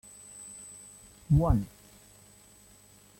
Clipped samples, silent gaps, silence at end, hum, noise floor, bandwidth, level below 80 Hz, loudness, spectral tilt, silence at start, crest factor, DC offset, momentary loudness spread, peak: under 0.1%; none; 1.55 s; 50 Hz at -45 dBFS; -57 dBFS; 16.5 kHz; -42 dBFS; -27 LUFS; -7.5 dB/octave; 0.35 s; 20 dB; under 0.1%; 23 LU; -12 dBFS